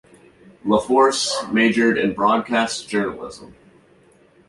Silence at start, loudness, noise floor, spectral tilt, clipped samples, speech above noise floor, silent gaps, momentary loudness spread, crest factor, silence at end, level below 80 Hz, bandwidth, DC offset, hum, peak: 0.65 s; -19 LUFS; -54 dBFS; -3.5 dB/octave; under 0.1%; 35 dB; none; 12 LU; 18 dB; 0.95 s; -56 dBFS; 11.5 kHz; under 0.1%; none; -2 dBFS